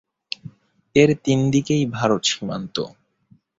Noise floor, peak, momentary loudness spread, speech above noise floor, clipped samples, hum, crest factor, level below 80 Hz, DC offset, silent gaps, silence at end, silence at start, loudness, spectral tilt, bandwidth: -58 dBFS; -2 dBFS; 16 LU; 38 dB; under 0.1%; none; 20 dB; -54 dBFS; under 0.1%; none; 0.7 s; 0.45 s; -20 LUFS; -5 dB/octave; 8 kHz